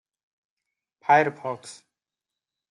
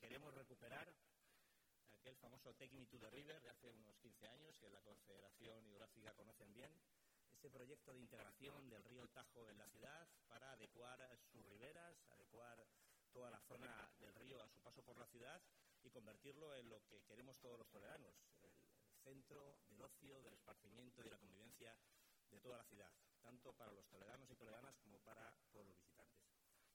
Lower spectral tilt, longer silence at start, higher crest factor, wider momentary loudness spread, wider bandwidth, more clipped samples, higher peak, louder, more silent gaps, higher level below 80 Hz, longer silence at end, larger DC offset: about the same, -5 dB/octave vs -4 dB/octave; first, 1.1 s vs 0 s; about the same, 22 dB vs 22 dB; first, 18 LU vs 7 LU; second, 11.5 kHz vs 18 kHz; neither; first, -6 dBFS vs -44 dBFS; first, -23 LUFS vs -64 LUFS; neither; first, -80 dBFS vs -88 dBFS; first, 1 s vs 0 s; neither